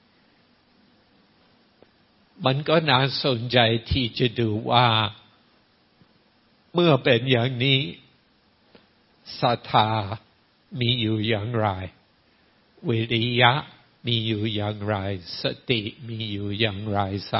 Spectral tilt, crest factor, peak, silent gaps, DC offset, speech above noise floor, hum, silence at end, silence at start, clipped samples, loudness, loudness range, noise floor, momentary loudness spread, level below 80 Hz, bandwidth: -9.5 dB/octave; 24 dB; 0 dBFS; none; under 0.1%; 39 dB; none; 0 s; 2.4 s; under 0.1%; -23 LUFS; 5 LU; -62 dBFS; 13 LU; -52 dBFS; 5.8 kHz